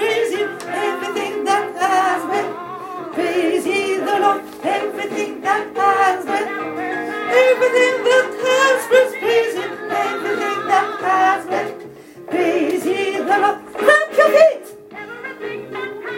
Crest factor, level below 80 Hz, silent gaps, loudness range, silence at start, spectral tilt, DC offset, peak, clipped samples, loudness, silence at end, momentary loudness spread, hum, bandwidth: 18 dB; -66 dBFS; none; 4 LU; 0 s; -3 dB/octave; under 0.1%; 0 dBFS; under 0.1%; -17 LUFS; 0 s; 14 LU; none; 16.5 kHz